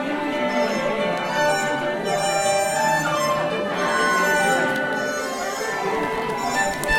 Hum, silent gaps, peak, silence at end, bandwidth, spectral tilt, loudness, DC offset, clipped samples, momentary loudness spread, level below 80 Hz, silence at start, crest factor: none; none; -6 dBFS; 0 s; 16.5 kHz; -3 dB/octave; -21 LUFS; under 0.1%; under 0.1%; 6 LU; -46 dBFS; 0 s; 16 dB